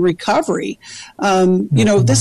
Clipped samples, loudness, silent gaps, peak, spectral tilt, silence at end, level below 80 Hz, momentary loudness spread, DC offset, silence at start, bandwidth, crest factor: under 0.1%; -15 LUFS; none; -4 dBFS; -5.5 dB/octave; 0 s; -46 dBFS; 15 LU; under 0.1%; 0 s; 12.5 kHz; 10 dB